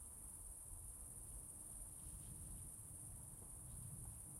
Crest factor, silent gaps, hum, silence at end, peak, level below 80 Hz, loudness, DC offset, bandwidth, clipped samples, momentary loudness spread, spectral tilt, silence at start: 14 dB; none; none; 0 s; -40 dBFS; -62 dBFS; -53 LUFS; under 0.1%; 16 kHz; under 0.1%; 1 LU; -4 dB/octave; 0 s